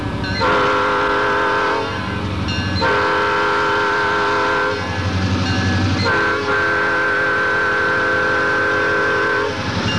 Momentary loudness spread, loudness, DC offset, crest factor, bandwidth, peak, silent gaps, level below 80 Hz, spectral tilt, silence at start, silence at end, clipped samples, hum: 5 LU; -17 LUFS; 0.8%; 10 dB; 11 kHz; -8 dBFS; none; -40 dBFS; -5 dB/octave; 0 s; 0 s; under 0.1%; none